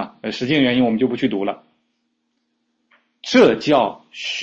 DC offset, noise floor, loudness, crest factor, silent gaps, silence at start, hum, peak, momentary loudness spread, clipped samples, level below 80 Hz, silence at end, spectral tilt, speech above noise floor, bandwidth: under 0.1%; -71 dBFS; -18 LUFS; 18 dB; none; 0 s; none; -2 dBFS; 14 LU; under 0.1%; -58 dBFS; 0 s; -5.5 dB/octave; 53 dB; 7.8 kHz